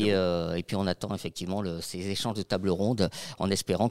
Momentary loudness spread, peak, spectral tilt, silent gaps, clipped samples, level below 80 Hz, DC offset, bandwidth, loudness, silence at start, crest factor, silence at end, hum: 7 LU; -10 dBFS; -5.5 dB/octave; none; under 0.1%; -60 dBFS; 0.3%; 16 kHz; -30 LUFS; 0 s; 18 dB; 0 s; none